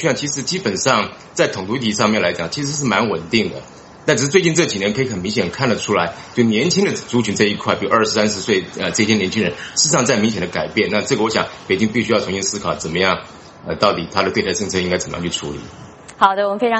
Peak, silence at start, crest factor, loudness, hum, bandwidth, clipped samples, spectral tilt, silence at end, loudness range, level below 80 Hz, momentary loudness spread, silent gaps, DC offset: 0 dBFS; 0 s; 18 dB; -18 LUFS; none; 8.4 kHz; under 0.1%; -3.5 dB/octave; 0 s; 2 LU; -50 dBFS; 7 LU; none; under 0.1%